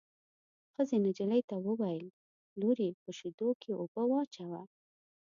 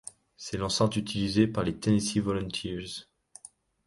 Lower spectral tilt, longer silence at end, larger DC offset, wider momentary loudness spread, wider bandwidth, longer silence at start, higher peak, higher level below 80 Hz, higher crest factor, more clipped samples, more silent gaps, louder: first, -7.5 dB/octave vs -5 dB/octave; second, 0.65 s vs 0.85 s; neither; second, 13 LU vs 20 LU; second, 7.4 kHz vs 11.5 kHz; first, 0.8 s vs 0.4 s; second, -20 dBFS vs -10 dBFS; second, -84 dBFS vs -52 dBFS; about the same, 16 dB vs 20 dB; neither; first, 1.44-1.48 s, 2.10-2.56 s, 2.94-3.06 s, 3.34-3.38 s, 3.55-3.60 s, 3.88-3.95 s, 4.27-4.31 s vs none; second, -35 LUFS vs -29 LUFS